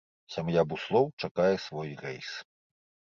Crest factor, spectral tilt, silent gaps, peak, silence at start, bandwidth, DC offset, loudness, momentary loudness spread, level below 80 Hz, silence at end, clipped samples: 20 dB; -6.5 dB/octave; 1.13-1.17 s, 1.31-1.35 s; -12 dBFS; 0.3 s; 7.4 kHz; under 0.1%; -30 LUFS; 13 LU; -64 dBFS; 0.75 s; under 0.1%